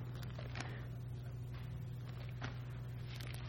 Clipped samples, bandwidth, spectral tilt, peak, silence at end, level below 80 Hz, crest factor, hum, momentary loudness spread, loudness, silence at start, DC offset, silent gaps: under 0.1%; 16.5 kHz; -6 dB/octave; -24 dBFS; 0 s; -56 dBFS; 20 dB; none; 2 LU; -47 LUFS; 0 s; under 0.1%; none